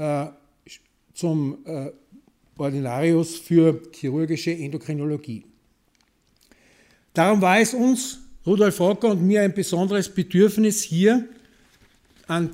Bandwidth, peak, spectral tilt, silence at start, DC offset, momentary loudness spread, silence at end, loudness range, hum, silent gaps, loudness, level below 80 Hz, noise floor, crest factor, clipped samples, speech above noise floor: 16 kHz; -4 dBFS; -5.5 dB/octave; 0 s; under 0.1%; 14 LU; 0 s; 7 LU; none; none; -22 LUFS; -60 dBFS; -65 dBFS; 18 dB; under 0.1%; 44 dB